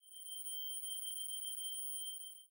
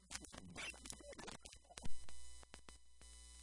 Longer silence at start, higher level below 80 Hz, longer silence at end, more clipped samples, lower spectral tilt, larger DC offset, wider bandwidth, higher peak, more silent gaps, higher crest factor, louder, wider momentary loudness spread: about the same, 0.05 s vs 0 s; second, under -90 dBFS vs -62 dBFS; about the same, 0.05 s vs 0 s; neither; second, 9 dB/octave vs -2.5 dB/octave; neither; first, 16 kHz vs 11.5 kHz; second, -34 dBFS vs -24 dBFS; neither; second, 12 dB vs 22 dB; first, -41 LUFS vs -54 LUFS; second, 4 LU vs 11 LU